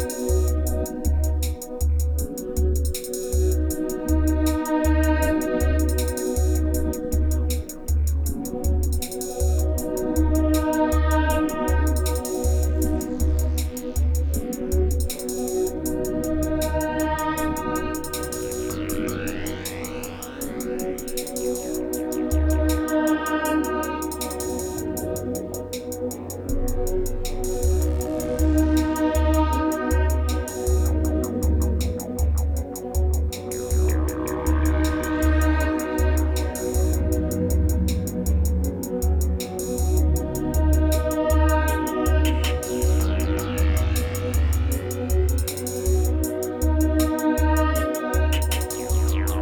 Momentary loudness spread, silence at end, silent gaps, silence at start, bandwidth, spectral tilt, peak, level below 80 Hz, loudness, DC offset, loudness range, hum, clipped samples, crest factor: 7 LU; 0 s; none; 0 s; 19.5 kHz; -6 dB/octave; -8 dBFS; -24 dBFS; -24 LUFS; under 0.1%; 5 LU; none; under 0.1%; 14 dB